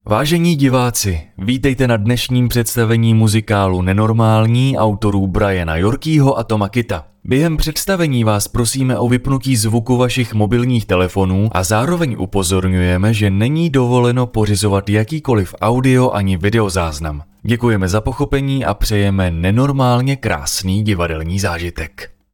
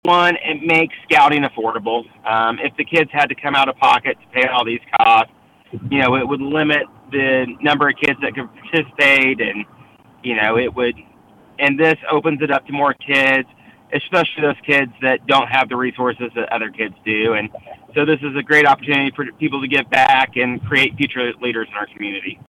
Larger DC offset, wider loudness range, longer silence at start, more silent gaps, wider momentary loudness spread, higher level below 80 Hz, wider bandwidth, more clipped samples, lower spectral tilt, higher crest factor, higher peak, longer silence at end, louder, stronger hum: neither; about the same, 2 LU vs 2 LU; about the same, 0.05 s vs 0.05 s; neither; second, 5 LU vs 11 LU; first, -32 dBFS vs -56 dBFS; first, 18 kHz vs 14.5 kHz; neither; about the same, -6 dB/octave vs -5.5 dB/octave; about the same, 14 dB vs 14 dB; first, 0 dBFS vs -4 dBFS; about the same, 0.25 s vs 0.2 s; about the same, -15 LUFS vs -16 LUFS; neither